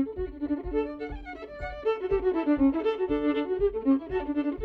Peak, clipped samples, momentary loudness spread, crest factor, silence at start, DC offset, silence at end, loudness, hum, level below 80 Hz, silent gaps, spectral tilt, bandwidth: -14 dBFS; under 0.1%; 14 LU; 14 dB; 0 s; under 0.1%; 0 s; -28 LUFS; none; -44 dBFS; none; -8.5 dB/octave; 5.2 kHz